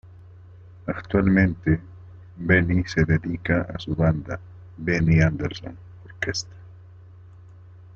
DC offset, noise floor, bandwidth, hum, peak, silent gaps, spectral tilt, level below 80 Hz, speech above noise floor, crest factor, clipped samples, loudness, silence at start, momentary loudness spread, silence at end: under 0.1%; -46 dBFS; 7.4 kHz; none; -6 dBFS; none; -7 dB/octave; -44 dBFS; 24 dB; 20 dB; under 0.1%; -23 LUFS; 0.05 s; 17 LU; 1.15 s